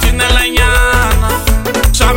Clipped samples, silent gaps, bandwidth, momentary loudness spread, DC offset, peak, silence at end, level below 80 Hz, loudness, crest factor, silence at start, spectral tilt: under 0.1%; none; 17 kHz; 3 LU; under 0.1%; 0 dBFS; 0 s; -12 dBFS; -11 LUFS; 10 dB; 0 s; -3.5 dB/octave